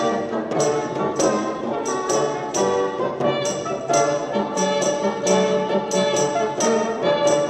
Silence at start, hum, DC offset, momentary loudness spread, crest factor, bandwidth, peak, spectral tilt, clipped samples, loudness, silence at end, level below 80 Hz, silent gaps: 0 s; none; under 0.1%; 5 LU; 14 dB; 14 kHz; -6 dBFS; -4 dB/octave; under 0.1%; -21 LUFS; 0 s; -58 dBFS; none